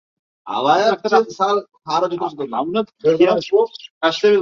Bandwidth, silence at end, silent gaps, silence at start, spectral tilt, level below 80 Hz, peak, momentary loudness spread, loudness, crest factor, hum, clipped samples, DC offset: 7.2 kHz; 0 s; 3.90-4.01 s; 0.45 s; -5 dB/octave; -64 dBFS; -2 dBFS; 9 LU; -18 LUFS; 16 dB; none; under 0.1%; under 0.1%